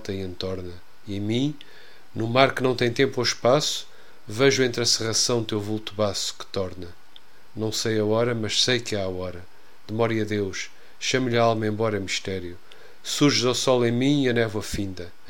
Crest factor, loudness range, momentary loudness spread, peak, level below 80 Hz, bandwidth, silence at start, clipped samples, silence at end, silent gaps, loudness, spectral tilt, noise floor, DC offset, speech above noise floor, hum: 24 dB; 4 LU; 15 LU; 0 dBFS; -56 dBFS; 16.5 kHz; 0 s; under 0.1%; 0.2 s; none; -24 LUFS; -4 dB/octave; -53 dBFS; 1%; 29 dB; none